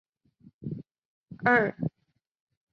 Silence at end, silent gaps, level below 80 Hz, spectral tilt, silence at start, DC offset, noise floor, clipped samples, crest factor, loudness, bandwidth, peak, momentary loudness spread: 0.85 s; 1.05-1.26 s; -66 dBFS; -8.5 dB/octave; 0.6 s; under 0.1%; -77 dBFS; under 0.1%; 22 dB; -26 LUFS; 6.8 kHz; -8 dBFS; 19 LU